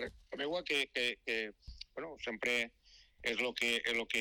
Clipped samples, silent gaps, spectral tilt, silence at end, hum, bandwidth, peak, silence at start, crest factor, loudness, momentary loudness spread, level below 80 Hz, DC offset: under 0.1%; none; -2 dB/octave; 0 s; none; 19 kHz; -24 dBFS; 0 s; 14 dB; -36 LUFS; 12 LU; -64 dBFS; under 0.1%